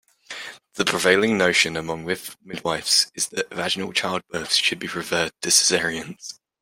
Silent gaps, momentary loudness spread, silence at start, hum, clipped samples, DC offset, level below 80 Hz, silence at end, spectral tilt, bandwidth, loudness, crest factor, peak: none; 17 LU; 0.3 s; none; under 0.1%; under 0.1%; -60 dBFS; 0.3 s; -1.5 dB/octave; 16.5 kHz; -21 LUFS; 22 dB; -2 dBFS